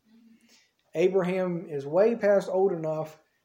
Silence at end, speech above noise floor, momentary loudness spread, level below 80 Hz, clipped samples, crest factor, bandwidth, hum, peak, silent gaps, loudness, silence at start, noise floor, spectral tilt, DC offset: 0.3 s; 38 dB; 11 LU; -80 dBFS; under 0.1%; 16 dB; 16 kHz; none; -12 dBFS; none; -26 LUFS; 0.95 s; -63 dBFS; -7.5 dB/octave; under 0.1%